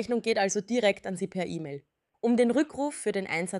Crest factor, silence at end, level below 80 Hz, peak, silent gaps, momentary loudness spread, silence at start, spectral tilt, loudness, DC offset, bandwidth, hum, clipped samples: 16 dB; 0 s; -70 dBFS; -12 dBFS; none; 10 LU; 0 s; -4.5 dB/octave; -28 LUFS; under 0.1%; 12 kHz; none; under 0.1%